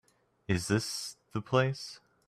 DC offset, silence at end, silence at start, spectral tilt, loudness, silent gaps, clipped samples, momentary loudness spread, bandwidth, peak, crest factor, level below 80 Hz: under 0.1%; 0.3 s; 0.5 s; -5 dB/octave; -32 LUFS; none; under 0.1%; 13 LU; 14 kHz; -12 dBFS; 20 dB; -64 dBFS